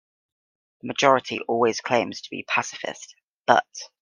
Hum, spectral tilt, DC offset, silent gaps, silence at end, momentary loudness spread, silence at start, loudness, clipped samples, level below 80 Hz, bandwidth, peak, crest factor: none; -3.5 dB/octave; under 0.1%; 3.24-3.45 s; 0.15 s; 14 LU; 0.85 s; -23 LUFS; under 0.1%; -72 dBFS; 10.5 kHz; 0 dBFS; 24 dB